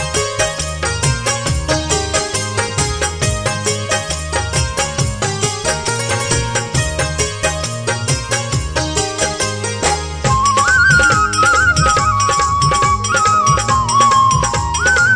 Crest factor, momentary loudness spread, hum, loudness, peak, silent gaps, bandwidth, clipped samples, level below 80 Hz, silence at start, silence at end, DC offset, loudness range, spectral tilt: 14 dB; 7 LU; none; -15 LUFS; 0 dBFS; none; 10.5 kHz; under 0.1%; -28 dBFS; 0 s; 0 s; under 0.1%; 5 LU; -3 dB/octave